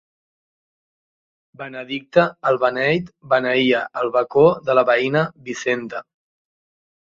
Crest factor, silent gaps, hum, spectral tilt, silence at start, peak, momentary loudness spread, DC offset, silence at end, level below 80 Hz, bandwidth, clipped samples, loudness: 20 dB; none; none; -5.5 dB/octave; 1.6 s; 0 dBFS; 15 LU; under 0.1%; 1.1 s; -60 dBFS; 7.6 kHz; under 0.1%; -19 LUFS